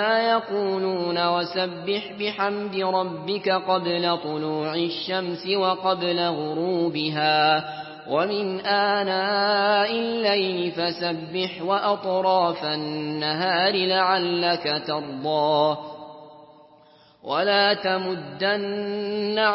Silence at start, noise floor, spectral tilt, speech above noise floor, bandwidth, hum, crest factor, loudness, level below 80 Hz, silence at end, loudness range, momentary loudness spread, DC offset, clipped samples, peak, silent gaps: 0 s; -54 dBFS; -9 dB/octave; 31 dB; 5.8 kHz; none; 18 dB; -23 LUFS; -72 dBFS; 0 s; 3 LU; 7 LU; under 0.1%; under 0.1%; -6 dBFS; none